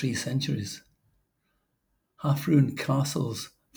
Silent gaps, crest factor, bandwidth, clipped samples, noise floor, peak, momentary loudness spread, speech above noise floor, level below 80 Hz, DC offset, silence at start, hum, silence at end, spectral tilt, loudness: none; 18 dB; over 20 kHz; under 0.1%; -76 dBFS; -10 dBFS; 13 LU; 49 dB; -66 dBFS; under 0.1%; 0 s; none; 0.3 s; -6 dB/octave; -28 LUFS